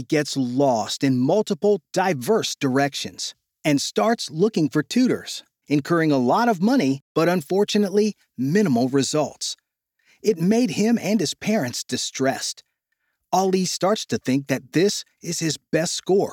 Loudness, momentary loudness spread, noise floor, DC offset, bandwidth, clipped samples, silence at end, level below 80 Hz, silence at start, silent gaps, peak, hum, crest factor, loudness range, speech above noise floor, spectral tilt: -22 LUFS; 8 LU; -75 dBFS; under 0.1%; 17.5 kHz; under 0.1%; 0 s; -70 dBFS; 0 s; 7.02-7.15 s; -6 dBFS; none; 16 dB; 3 LU; 54 dB; -4.5 dB/octave